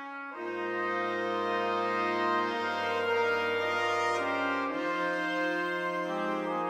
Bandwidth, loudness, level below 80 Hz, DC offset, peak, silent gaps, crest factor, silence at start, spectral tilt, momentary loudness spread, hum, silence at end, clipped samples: 16 kHz; -30 LUFS; -86 dBFS; under 0.1%; -16 dBFS; none; 14 dB; 0 s; -4.5 dB/octave; 4 LU; none; 0 s; under 0.1%